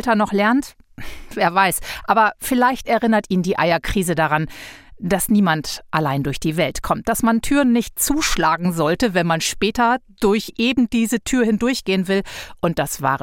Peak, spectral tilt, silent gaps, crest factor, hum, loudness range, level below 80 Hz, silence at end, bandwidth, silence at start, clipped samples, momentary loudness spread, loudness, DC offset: -2 dBFS; -4.5 dB/octave; none; 18 dB; none; 2 LU; -38 dBFS; 0 s; 17 kHz; 0 s; under 0.1%; 7 LU; -19 LUFS; under 0.1%